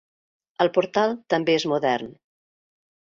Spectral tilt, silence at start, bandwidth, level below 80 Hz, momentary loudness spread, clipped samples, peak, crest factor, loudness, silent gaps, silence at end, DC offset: -5 dB/octave; 0.6 s; 7.6 kHz; -68 dBFS; 5 LU; under 0.1%; -4 dBFS; 20 dB; -23 LUFS; none; 0.95 s; under 0.1%